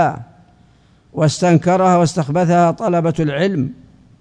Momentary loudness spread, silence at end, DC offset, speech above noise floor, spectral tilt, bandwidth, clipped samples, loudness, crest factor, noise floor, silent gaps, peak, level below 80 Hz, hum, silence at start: 10 LU; 0.45 s; under 0.1%; 36 dB; -6.5 dB/octave; 10 kHz; under 0.1%; -16 LUFS; 16 dB; -51 dBFS; none; 0 dBFS; -50 dBFS; none; 0 s